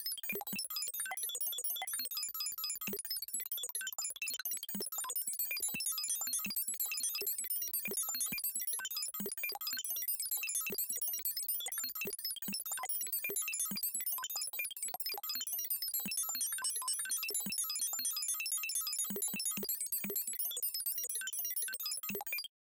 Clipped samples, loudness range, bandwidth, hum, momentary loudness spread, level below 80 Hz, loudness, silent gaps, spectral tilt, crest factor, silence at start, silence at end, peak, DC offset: under 0.1%; 2 LU; 17 kHz; none; 4 LU; -82 dBFS; -36 LUFS; none; 0.5 dB/octave; 14 dB; 0 s; 0.25 s; -24 dBFS; under 0.1%